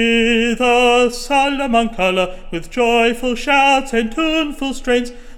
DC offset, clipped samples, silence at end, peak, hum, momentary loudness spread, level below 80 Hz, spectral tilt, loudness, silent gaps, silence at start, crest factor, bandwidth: under 0.1%; under 0.1%; 0 s; -2 dBFS; none; 8 LU; -34 dBFS; -3.5 dB/octave; -15 LUFS; none; 0 s; 14 dB; 16.5 kHz